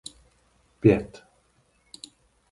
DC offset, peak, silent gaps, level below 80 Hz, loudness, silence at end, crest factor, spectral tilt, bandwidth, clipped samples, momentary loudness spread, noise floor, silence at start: under 0.1%; -4 dBFS; none; -52 dBFS; -23 LUFS; 1.45 s; 24 dB; -7.5 dB/octave; 11.5 kHz; under 0.1%; 23 LU; -65 dBFS; 0.85 s